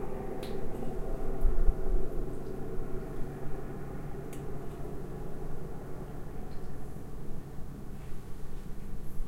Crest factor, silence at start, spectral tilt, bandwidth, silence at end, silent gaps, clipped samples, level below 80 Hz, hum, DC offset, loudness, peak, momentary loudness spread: 20 dB; 0 s; -7.5 dB/octave; 4.6 kHz; 0 s; none; under 0.1%; -34 dBFS; none; under 0.1%; -41 LUFS; -10 dBFS; 10 LU